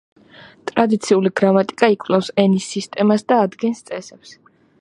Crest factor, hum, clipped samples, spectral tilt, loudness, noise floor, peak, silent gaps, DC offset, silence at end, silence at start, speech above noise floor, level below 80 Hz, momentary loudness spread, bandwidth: 18 dB; none; under 0.1%; -6 dB/octave; -17 LUFS; -45 dBFS; 0 dBFS; none; under 0.1%; 0.5 s; 0.65 s; 28 dB; -66 dBFS; 11 LU; 11 kHz